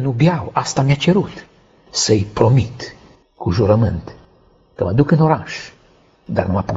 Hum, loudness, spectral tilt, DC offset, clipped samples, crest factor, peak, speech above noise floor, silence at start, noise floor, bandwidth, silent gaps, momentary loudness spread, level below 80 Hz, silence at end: none; -17 LUFS; -6 dB/octave; under 0.1%; under 0.1%; 18 dB; 0 dBFS; 36 dB; 0 s; -52 dBFS; 8 kHz; none; 15 LU; -42 dBFS; 0 s